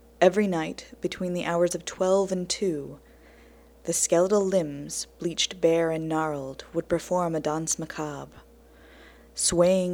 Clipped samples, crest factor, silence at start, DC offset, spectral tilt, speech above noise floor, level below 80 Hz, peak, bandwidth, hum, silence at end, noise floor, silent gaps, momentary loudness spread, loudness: under 0.1%; 20 dB; 0.2 s; under 0.1%; -4 dB/octave; 27 dB; -54 dBFS; -6 dBFS; 18 kHz; none; 0 s; -53 dBFS; none; 13 LU; -26 LUFS